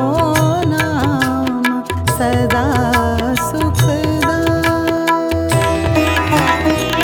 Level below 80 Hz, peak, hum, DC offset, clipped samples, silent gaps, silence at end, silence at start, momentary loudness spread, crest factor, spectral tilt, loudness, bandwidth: -30 dBFS; 0 dBFS; none; under 0.1%; under 0.1%; none; 0 s; 0 s; 3 LU; 14 dB; -5.5 dB/octave; -15 LUFS; 19.5 kHz